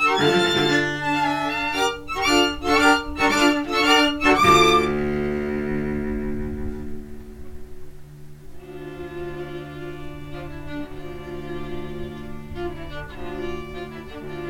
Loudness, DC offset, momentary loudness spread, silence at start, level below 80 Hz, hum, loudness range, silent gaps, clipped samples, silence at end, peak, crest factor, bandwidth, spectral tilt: -20 LUFS; under 0.1%; 19 LU; 0 s; -40 dBFS; none; 18 LU; none; under 0.1%; 0 s; -4 dBFS; 20 dB; 16.5 kHz; -4 dB/octave